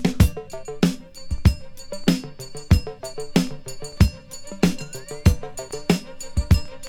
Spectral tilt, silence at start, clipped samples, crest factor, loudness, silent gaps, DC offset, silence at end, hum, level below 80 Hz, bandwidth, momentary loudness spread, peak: -6 dB/octave; 0 s; under 0.1%; 22 dB; -23 LUFS; none; under 0.1%; 0 s; none; -28 dBFS; 18 kHz; 15 LU; 0 dBFS